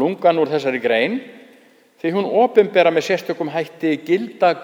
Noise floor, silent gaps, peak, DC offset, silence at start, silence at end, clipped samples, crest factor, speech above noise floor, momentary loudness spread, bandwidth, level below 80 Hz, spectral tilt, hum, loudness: -51 dBFS; none; 0 dBFS; under 0.1%; 0 s; 0 s; under 0.1%; 18 dB; 33 dB; 9 LU; 17 kHz; -74 dBFS; -5.5 dB/octave; none; -18 LUFS